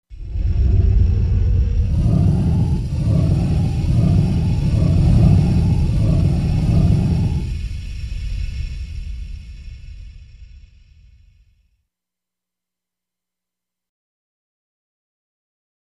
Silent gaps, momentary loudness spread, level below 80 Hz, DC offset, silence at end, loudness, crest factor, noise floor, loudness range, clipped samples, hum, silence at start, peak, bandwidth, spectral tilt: none; 16 LU; -24 dBFS; under 0.1%; 5.4 s; -18 LUFS; 16 dB; -87 dBFS; 16 LU; under 0.1%; 60 Hz at -35 dBFS; 0.1 s; -2 dBFS; 10.5 kHz; -9 dB/octave